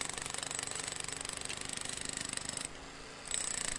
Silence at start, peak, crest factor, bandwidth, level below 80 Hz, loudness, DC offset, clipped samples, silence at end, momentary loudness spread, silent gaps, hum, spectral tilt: 0 s; -16 dBFS; 24 dB; 11.5 kHz; -60 dBFS; -38 LUFS; under 0.1%; under 0.1%; 0 s; 7 LU; none; none; -0.5 dB/octave